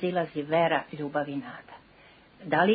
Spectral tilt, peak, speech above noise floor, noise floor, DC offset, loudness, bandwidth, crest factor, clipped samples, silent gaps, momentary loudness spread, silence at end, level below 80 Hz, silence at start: -10 dB/octave; -10 dBFS; 29 dB; -56 dBFS; under 0.1%; -29 LUFS; 4.9 kHz; 20 dB; under 0.1%; none; 19 LU; 0 s; -68 dBFS; 0 s